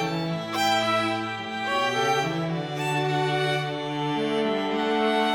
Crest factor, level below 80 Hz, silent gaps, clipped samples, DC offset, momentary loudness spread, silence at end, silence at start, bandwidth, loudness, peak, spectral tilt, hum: 14 dB; -64 dBFS; none; under 0.1%; under 0.1%; 6 LU; 0 s; 0 s; 18 kHz; -25 LUFS; -12 dBFS; -5 dB/octave; none